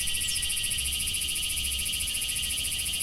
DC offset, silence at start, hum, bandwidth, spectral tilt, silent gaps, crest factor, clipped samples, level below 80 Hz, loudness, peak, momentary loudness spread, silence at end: under 0.1%; 0 s; none; 16.5 kHz; 0.5 dB/octave; none; 14 dB; under 0.1%; -42 dBFS; -27 LUFS; -16 dBFS; 1 LU; 0 s